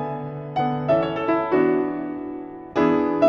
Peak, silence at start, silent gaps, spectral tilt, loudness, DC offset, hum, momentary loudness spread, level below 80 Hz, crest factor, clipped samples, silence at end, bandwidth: -6 dBFS; 0 s; none; -8.5 dB/octave; -23 LUFS; under 0.1%; none; 11 LU; -56 dBFS; 16 dB; under 0.1%; 0 s; 6.6 kHz